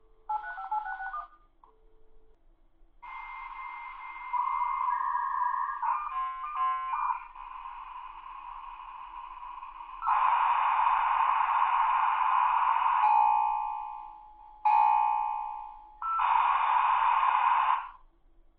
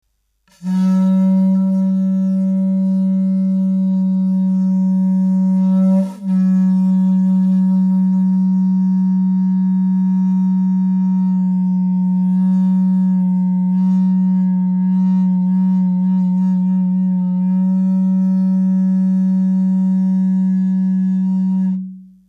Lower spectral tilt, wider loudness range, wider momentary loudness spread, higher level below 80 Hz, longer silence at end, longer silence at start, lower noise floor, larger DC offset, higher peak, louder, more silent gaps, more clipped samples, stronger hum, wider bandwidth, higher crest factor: second, 3.5 dB/octave vs -11 dB/octave; first, 14 LU vs 1 LU; first, 18 LU vs 2 LU; first, -60 dBFS vs -70 dBFS; first, 0.65 s vs 0.25 s; second, 0.3 s vs 0.6 s; about the same, -60 dBFS vs -60 dBFS; neither; second, -12 dBFS vs -8 dBFS; second, -28 LUFS vs -15 LUFS; neither; neither; neither; first, 4.3 kHz vs 1.8 kHz; first, 18 dB vs 6 dB